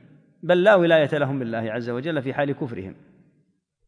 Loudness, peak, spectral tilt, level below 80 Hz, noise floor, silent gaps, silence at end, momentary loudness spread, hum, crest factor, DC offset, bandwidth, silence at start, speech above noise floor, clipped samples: -21 LUFS; -4 dBFS; -7.5 dB/octave; -70 dBFS; -67 dBFS; none; 0.95 s; 17 LU; none; 18 dB; under 0.1%; 10.5 kHz; 0.45 s; 46 dB; under 0.1%